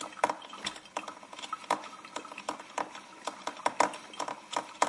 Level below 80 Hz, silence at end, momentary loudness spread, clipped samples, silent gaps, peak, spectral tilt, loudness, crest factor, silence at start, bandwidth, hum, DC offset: -80 dBFS; 0 s; 11 LU; under 0.1%; none; -10 dBFS; -1.5 dB/octave; -36 LUFS; 28 dB; 0 s; 11.5 kHz; none; under 0.1%